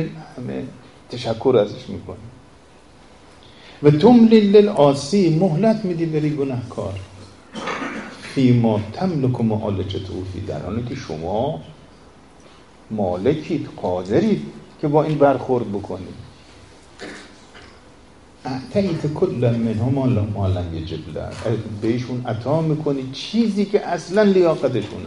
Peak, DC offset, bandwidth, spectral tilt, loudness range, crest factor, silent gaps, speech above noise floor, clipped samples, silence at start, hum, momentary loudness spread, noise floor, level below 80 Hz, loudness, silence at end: 0 dBFS; 0.2%; 11 kHz; -7.5 dB/octave; 10 LU; 20 dB; none; 29 dB; under 0.1%; 0 s; none; 17 LU; -48 dBFS; -50 dBFS; -20 LUFS; 0 s